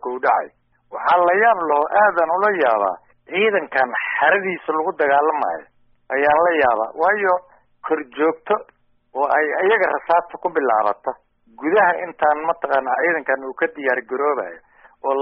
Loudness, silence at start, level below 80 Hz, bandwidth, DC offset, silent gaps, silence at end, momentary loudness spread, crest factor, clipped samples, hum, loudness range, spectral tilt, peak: -19 LUFS; 0.05 s; -62 dBFS; 5.6 kHz; under 0.1%; none; 0 s; 10 LU; 16 dB; under 0.1%; none; 3 LU; -1.5 dB/octave; -2 dBFS